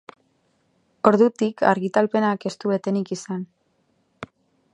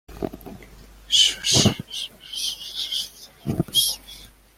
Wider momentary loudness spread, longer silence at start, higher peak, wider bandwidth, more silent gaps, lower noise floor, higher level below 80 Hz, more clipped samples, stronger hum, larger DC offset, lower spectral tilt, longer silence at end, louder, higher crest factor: first, 23 LU vs 18 LU; first, 1.05 s vs 0.1 s; first, 0 dBFS vs -4 dBFS; second, 10.5 kHz vs 16.5 kHz; neither; first, -67 dBFS vs -46 dBFS; second, -68 dBFS vs -48 dBFS; neither; neither; neither; first, -6.5 dB/octave vs -2.5 dB/octave; first, 0.5 s vs 0.3 s; about the same, -22 LUFS vs -21 LUFS; about the same, 22 dB vs 22 dB